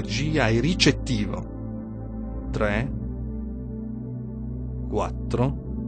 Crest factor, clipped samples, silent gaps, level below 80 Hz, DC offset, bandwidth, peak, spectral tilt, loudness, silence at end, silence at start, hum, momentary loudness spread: 22 dB; under 0.1%; none; -34 dBFS; under 0.1%; 9 kHz; -4 dBFS; -5.5 dB/octave; -27 LUFS; 0 s; 0 s; none; 13 LU